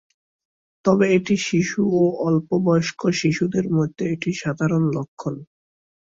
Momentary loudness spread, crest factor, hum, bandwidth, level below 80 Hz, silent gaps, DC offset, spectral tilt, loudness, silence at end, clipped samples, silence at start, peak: 7 LU; 18 dB; none; 7.8 kHz; -58 dBFS; 5.08-5.17 s; under 0.1%; -6.5 dB/octave; -21 LUFS; 0.65 s; under 0.1%; 0.85 s; -4 dBFS